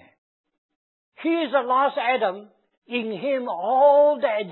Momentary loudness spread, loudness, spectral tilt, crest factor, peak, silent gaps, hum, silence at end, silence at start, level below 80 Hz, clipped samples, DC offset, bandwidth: 12 LU; -21 LUFS; -9 dB/octave; 16 dB; -6 dBFS; 2.78-2.82 s; none; 0 s; 1.2 s; -84 dBFS; under 0.1%; under 0.1%; 4.2 kHz